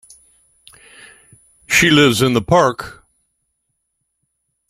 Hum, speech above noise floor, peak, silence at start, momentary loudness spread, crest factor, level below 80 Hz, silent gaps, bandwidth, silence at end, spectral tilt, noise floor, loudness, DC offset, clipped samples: none; 59 dB; 0 dBFS; 1.7 s; 15 LU; 18 dB; -48 dBFS; none; 16 kHz; 1.8 s; -4 dB/octave; -72 dBFS; -13 LUFS; under 0.1%; under 0.1%